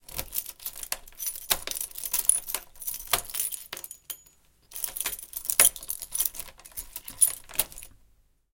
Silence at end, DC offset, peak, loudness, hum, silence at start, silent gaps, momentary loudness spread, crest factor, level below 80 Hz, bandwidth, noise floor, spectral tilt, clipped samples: 0.65 s; under 0.1%; -2 dBFS; -27 LUFS; none; 0.1 s; none; 17 LU; 30 dB; -54 dBFS; 17.5 kHz; -63 dBFS; 1 dB/octave; under 0.1%